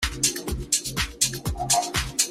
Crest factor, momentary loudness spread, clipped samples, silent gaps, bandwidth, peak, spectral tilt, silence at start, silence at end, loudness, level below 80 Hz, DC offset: 22 dB; 6 LU; under 0.1%; none; 16 kHz; -4 dBFS; -1.5 dB/octave; 0 s; 0 s; -24 LUFS; -38 dBFS; under 0.1%